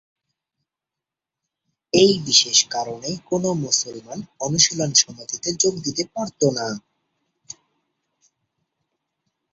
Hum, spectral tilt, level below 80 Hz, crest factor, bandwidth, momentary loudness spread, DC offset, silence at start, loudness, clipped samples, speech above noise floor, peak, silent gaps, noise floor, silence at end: none; -2.5 dB/octave; -62 dBFS; 24 dB; 8 kHz; 15 LU; under 0.1%; 1.95 s; -19 LUFS; under 0.1%; 66 dB; 0 dBFS; none; -87 dBFS; 2.75 s